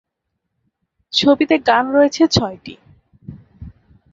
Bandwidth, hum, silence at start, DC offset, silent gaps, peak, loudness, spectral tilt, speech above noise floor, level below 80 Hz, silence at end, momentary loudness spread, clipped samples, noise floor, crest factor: 7.8 kHz; none; 1.15 s; under 0.1%; none; 0 dBFS; -15 LUFS; -4.5 dB/octave; 61 dB; -46 dBFS; 0.45 s; 15 LU; under 0.1%; -76 dBFS; 18 dB